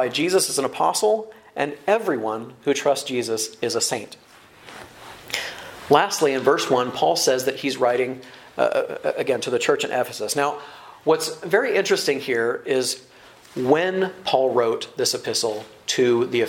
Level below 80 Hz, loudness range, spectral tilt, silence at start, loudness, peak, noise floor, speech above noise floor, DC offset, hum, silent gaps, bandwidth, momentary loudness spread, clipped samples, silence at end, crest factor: -66 dBFS; 3 LU; -3 dB/octave; 0 s; -22 LUFS; -2 dBFS; -45 dBFS; 24 dB; under 0.1%; none; none; 16.5 kHz; 12 LU; under 0.1%; 0 s; 22 dB